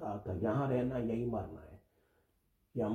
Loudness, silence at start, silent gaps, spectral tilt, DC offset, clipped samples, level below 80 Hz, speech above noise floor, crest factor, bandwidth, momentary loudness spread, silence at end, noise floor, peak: -36 LUFS; 0 s; none; -9.5 dB/octave; under 0.1%; under 0.1%; -60 dBFS; 41 dB; 16 dB; 13.5 kHz; 13 LU; 0 s; -76 dBFS; -22 dBFS